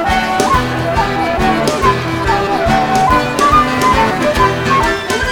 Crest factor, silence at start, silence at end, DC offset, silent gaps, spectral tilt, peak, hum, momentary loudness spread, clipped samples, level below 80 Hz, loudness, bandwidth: 12 dB; 0 s; 0 s; 0.2%; none; -4.5 dB/octave; 0 dBFS; none; 4 LU; under 0.1%; -26 dBFS; -13 LUFS; 19 kHz